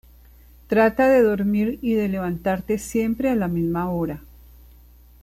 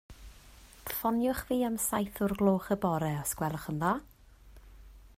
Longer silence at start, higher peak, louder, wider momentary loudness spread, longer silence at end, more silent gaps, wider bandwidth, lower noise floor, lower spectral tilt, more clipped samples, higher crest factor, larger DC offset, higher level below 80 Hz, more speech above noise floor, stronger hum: first, 0.7 s vs 0.1 s; first, -6 dBFS vs -14 dBFS; first, -21 LUFS vs -31 LUFS; first, 9 LU vs 6 LU; first, 0.95 s vs 0.1 s; neither; about the same, 15 kHz vs 16 kHz; second, -49 dBFS vs -55 dBFS; first, -7 dB/octave vs -5.5 dB/octave; neither; about the same, 16 dB vs 18 dB; neither; first, -46 dBFS vs -54 dBFS; first, 28 dB vs 24 dB; first, 60 Hz at -40 dBFS vs none